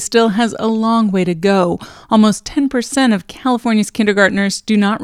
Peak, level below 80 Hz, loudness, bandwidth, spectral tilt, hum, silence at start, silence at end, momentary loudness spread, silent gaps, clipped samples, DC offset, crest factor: 0 dBFS; -48 dBFS; -15 LUFS; 13.5 kHz; -5 dB/octave; none; 0 s; 0 s; 5 LU; none; under 0.1%; under 0.1%; 14 dB